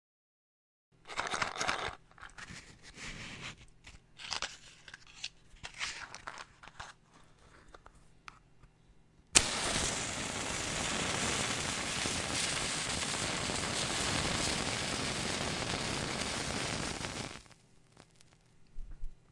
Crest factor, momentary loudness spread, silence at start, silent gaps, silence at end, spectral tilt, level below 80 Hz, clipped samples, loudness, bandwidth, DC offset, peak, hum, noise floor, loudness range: 36 dB; 20 LU; 1.05 s; none; 0.15 s; -2 dB/octave; -54 dBFS; under 0.1%; -34 LUFS; 12 kHz; under 0.1%; -2 dBFS; none; -63 dBFS; 13 LU